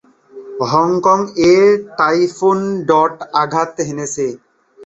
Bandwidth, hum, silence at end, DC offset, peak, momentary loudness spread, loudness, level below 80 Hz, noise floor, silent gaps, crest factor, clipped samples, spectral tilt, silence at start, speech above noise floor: 8.2 kHz; none; 0 s; under 0.1%; -2 dBFS; 11 LU; -15 LUFS; -54 dBFS; -37 dBFS; none; 14 dB; under 0.1%; -5 dB/octave; 0.35 s; 23 dB